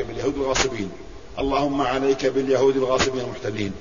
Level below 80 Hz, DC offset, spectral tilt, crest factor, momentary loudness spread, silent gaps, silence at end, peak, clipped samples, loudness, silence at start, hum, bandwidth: -42 dBFS; 0.8%; -4 dB/octave; 18 dB; 11 LU; none; 0 s; -6 dBFS; under 0.1%; -22 LUFS; 0 s; none; 7.4 kHz